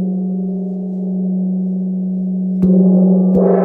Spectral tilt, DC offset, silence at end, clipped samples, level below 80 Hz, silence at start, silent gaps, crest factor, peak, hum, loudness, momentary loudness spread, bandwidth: -13.5 dB/octave; under 0.1%; 0 s; under 0.1%; -48 dBFS; 0 s; none; 12 dB; -2 dBFS; none; -15 LUFS; 10 LU; 2 kHz